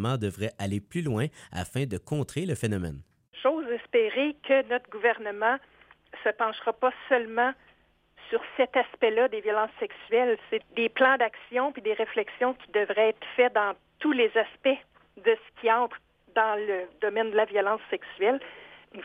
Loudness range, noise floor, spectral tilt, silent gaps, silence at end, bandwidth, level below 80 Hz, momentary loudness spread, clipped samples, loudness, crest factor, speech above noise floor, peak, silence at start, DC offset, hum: 4 LU; -63 dBFS; -5.5 dB/octave; none; 0 s; 15 kHz; -62 dBFS; 9 LU; under 0.1%; -27 LUFS; 18 dB; 36 dB; -8 dBFS; 0 s; under 0.1%; none